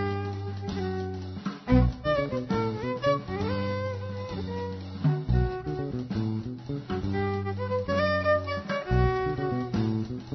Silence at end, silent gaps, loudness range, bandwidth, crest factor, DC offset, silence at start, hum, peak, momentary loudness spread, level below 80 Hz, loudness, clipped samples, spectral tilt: 0 s; none; 3 LU; 6.2 kHz; 20 dB; under 0.1%; 0 s; none; -8 dBFS; 10 LU; -38 dBFS; -29 LUFS; under 0.1%; -8 dB/octave